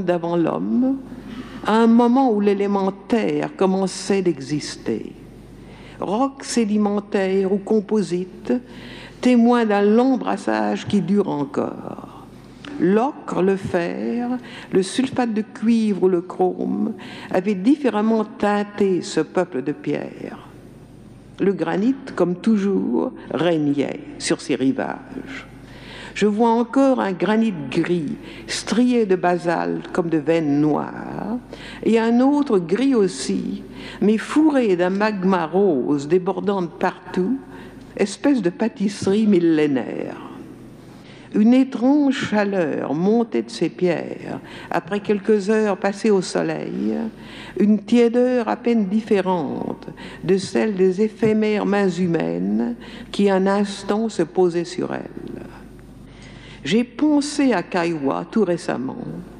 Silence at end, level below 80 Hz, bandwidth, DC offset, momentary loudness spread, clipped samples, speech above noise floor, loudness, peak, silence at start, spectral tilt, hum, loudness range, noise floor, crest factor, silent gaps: 0 s; -54 dBFS; 11 kHz; under 0.1%; 15 LU; under 0.1%; 23 dB; -20 LUFS; -6 dBFS; 0 s; -6 dB/octave; none; 4 LU; -42 dBFS; 14 dB; none